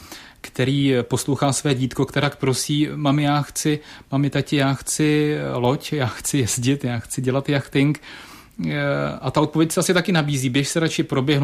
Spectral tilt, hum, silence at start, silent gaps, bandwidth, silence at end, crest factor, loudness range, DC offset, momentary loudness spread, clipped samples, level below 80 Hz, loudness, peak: -5 dB/octave; none; 0 s; none; 15.5 kHz; 0 s; 16 dB; 2 LU; under 0.1%; 7 LU; under 0.1%; -52 dBFS; -21 LUFS; -6 dBFS